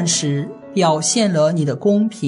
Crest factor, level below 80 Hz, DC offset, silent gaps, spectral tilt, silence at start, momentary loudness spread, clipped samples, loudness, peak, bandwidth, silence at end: 14 dB; -64 dBFS; under 0.1%; none; -4.5 dB/octave; 0 s; 7 LU; under 0.1%; -17 LUFS; -4 dBFS; 11 kHz; 0 s